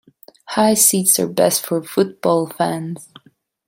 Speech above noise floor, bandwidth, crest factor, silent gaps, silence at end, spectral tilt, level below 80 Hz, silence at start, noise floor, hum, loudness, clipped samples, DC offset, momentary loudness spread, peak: 37 dB; 17 kHz; 18 dB; none; 0.65 s; -3.5 dB/octave; -64 dBFS; 0.5 s; -54 dBFS; none; -16 LUFS; under 0.1%; under 0.1%; 13 LU; 0 dBFS